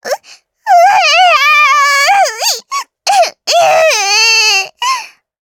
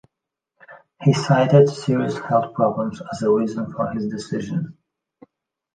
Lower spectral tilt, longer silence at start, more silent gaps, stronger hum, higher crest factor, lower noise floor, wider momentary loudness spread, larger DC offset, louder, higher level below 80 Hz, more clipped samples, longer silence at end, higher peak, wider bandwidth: second, 2.5 dB/octave vs -7 dB/octave; second, 0.05 s vs 0.7 s; neither; neither; second, 10 dB vs 20 dB; second, -41 dBFS vs -84 dBFS; about the same, 11 LU vs 12 LU; neither; first, -8 LUFS vs -20 LUFS; second, -68 dBFS vs -60 dBFS; neither; second, 0.35 s vs 1.05 s; about the same, 0 dBFS vs -2 dBFS; first, 18.5 kHz vs 9.2 kHz